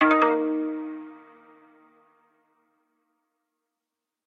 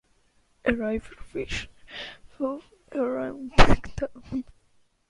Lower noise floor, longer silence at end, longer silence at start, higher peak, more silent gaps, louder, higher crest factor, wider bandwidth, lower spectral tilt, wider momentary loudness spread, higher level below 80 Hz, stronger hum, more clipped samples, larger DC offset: first, -86 dBFS vs -65 dBFS; first, 3.1 s vs 0.65 s; second, 0 s vs 0.65 s; second, -6 dBFS vs -2 dBFS; neither; first, -24 LUFS vs -28 LUFS; about the same, 22 dB vs 24 dB; second, 5.4 kHz vs 10.5 kHz; about the same, -5.5 dB/octave vs -5.5 dB/octave; first, 21 LU vs 17 LU; second, -80 dBFS vs -34 dBFS; neither; neither; neither